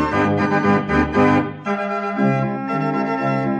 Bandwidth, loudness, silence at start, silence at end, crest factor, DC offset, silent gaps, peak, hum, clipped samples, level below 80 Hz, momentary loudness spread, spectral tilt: 8.6 kHz; -19 LUFS; 0 s; 0 s; 14 dB; under 0.1%; none; -4 dBFS; none; under 0.1%; -42 dBFS; 6 LU; -8 dB/octave